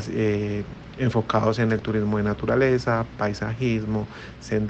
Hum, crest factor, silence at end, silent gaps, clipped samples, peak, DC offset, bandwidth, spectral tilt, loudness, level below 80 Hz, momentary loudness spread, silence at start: none; 16 dB; 0 s; none; under 0.1%; -6 dBFS; under 0.1%; 8.2 kHz; -7.5 dB/octave; -24 LUFS; -46 dBFS; 8 LU; 0 s